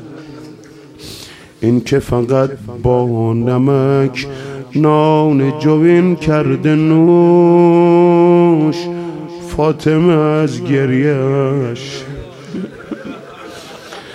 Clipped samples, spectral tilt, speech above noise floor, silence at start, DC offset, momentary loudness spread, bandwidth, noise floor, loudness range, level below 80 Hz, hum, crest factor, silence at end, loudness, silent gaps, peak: under 0.1%; -8 dB/octave; 25 dB; 0 s; under 0.1%; 21 LU; 10.5 kHz; -37 dBFS; 7 LU; -42 dBFS; none; 12 dB; 0 s; -12 LUFS; none; 0 dBFS